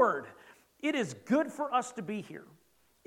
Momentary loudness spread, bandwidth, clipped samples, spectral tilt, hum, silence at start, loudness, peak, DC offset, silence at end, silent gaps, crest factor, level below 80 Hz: 17 LU; 16.5 kHz; under 0.1%; -5 dB/octave; none; 0 s; -33 LUFS; -12 dBFS; under 0.1%; 0.6 s; none; 22 dB; -82 dBFS